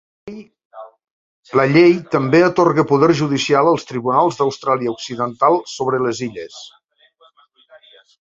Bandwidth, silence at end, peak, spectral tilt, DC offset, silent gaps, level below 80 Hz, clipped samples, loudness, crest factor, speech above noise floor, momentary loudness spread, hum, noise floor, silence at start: 7.8 kHz; 1.6 s; 0 dBFS; -6 dB/octave; under 0.1%; 0.65-0.71 s, 1.11-1.43 s; -58 dBFS; under 0.1%; -16 LUFS; 18 dB; 39 dB; 20 LU; none; -55 dBFS; 0.25 s